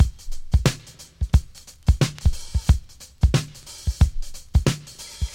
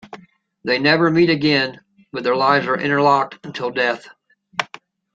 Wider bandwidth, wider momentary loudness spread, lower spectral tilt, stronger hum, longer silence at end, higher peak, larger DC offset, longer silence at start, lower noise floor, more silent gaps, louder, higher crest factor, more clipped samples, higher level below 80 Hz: first, 16 kHz vs 7.6 kHz; about the same, 15 LU vs 13 LU; about the same, -5.5 dB/octave vs -6 dB/octave; neither; second, 0 s vs 0.5 s; about the same, 0 dBFS vs 0 dBFS; neither; about the same, 0 s vs 0.05 s; second, -41 dBFS vs -45 dBFS; neither; second, -24 LUFS vs -18 LUFS; about the same, 22 dB vs 18 dB; neither; first, -24 dBFS vs -60 dBFS